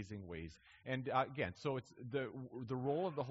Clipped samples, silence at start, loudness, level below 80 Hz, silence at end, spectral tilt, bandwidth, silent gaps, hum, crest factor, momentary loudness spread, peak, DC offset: under 0.1%; 0 s; -42 LUFS; -68 dBFS; 0 s; -5.5 dB/octave; 7.6 kHz; none; none; 20 dB; 12 LU; -22 dBFS; under 0.1%